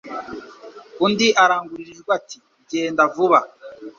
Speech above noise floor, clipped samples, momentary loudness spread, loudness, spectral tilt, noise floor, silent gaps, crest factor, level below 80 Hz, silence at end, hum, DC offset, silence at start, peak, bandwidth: 23 dB; under 0.1%; 22 LU; -18 LUFS; -3.5 dB/octave; -41 dBFS; none; 20 dB; -66 dBFS; 0.1 s; none; under 0.1%; 0.05 s; -2 dBFS; 7.6 kHz